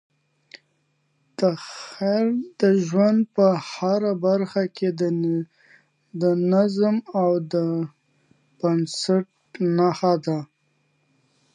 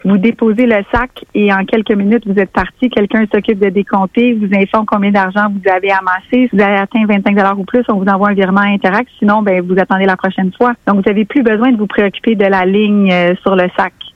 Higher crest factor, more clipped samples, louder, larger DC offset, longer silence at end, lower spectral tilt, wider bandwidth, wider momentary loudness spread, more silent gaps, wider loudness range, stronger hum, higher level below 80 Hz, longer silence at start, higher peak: first, 18 dB vs 10 dB; neither; second, -22 LUFS vs -12 LUFS; neither; first, 1.1 s vs 0.05 s; second, -7 dB/octave vs -8.5 dB/octave; first, 10 kHz vs 5.6 kHz; first, 9 LU vs 3 LU; neither; about the same, 3 LU vs 1 LU; neither; second, -74 dBFS vs -40 dBFS; first, 1.4 s vs 0.05 s; second, -6 dBFS vs 0 dBFS